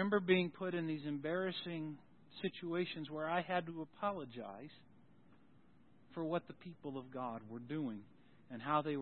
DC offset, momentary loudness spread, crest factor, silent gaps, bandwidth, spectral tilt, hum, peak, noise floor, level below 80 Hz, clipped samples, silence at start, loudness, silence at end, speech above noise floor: under 0.1%; 16 LU; 22 dB; none; 4.3 kHz; -4.5 dB/octave; none; -20 dBFS; -68 dBFS; -82 dBFS; under 0.1%; 0 s; -41 LUFS; 0 s; 28 dB